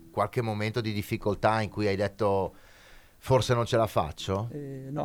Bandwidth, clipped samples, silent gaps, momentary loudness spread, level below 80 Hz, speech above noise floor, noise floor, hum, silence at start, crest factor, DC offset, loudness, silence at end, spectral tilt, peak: 17.5 kHz; under 0.1%; none; 10 LU; -52 dBFS; 25 dB; -53 dBFS; none; 0 s; 18 dB; under 0.1%; -29 LUFS; 0 s; -6 dB/octave; -10 dBFS